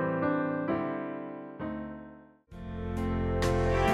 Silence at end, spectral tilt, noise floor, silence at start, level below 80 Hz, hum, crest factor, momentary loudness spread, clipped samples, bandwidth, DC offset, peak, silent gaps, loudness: 0 s; -7 dB/octave; -51 dBFS; 0 s; -42 dBFS; none; 16 dB; 17 LU; under 0.1%; 13.5 kHz; under 0.1%; -14 dBFS; none; -32 LUFS